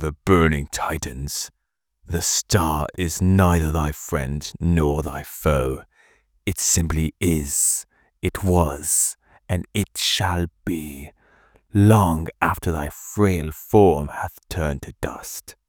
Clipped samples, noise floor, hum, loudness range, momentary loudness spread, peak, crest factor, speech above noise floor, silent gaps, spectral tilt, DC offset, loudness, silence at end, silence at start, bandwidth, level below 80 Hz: under 0.1%; -61 dBFS; none; 3 LU; 12 LU; 0 dBFS; 20 dB; 40 dB; none; -4.5 dB/octave; under 0.1%; -21 LUFS; 0.15 s; 0 s; over 20 kHz; -36 dBFS